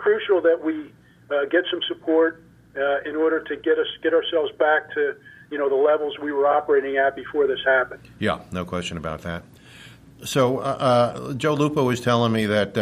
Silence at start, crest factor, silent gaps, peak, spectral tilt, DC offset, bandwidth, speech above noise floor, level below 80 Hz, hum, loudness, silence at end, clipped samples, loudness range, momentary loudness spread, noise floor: 0 s; 16 dB; none; -6 dBFS; -5.5 dB/octave; under 0.1%; 15 kHz; 24 dB; -56 dBFS; none; -22 LUFS; 0 s; under 0.1%; 3 LU; 10 LU; -46 dBFS